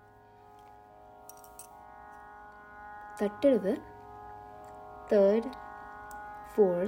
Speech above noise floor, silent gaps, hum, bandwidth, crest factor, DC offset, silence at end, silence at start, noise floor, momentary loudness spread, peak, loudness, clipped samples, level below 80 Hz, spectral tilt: 30 dB; none; none; 16 kHz; 20 dB; under 0.1%; 0 s; 1.6 s; -56 dBFS; 24 LU; -14 dBFS; -29 LUFS; under 0.1%; -64 dBFS; -7 dB/octave